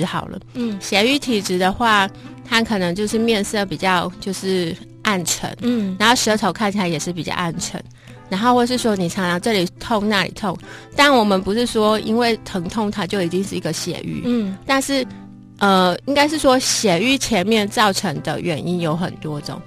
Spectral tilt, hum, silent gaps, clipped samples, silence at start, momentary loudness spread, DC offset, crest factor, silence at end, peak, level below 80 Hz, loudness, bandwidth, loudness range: -4 dB/octave; none; none; under 0.1%; 0 s; 10 LU; under 0.1%; 16 dB; 0 s; -2 dBFS; -46 dBFS; -19 LUFS; 14 kHz; 3 LU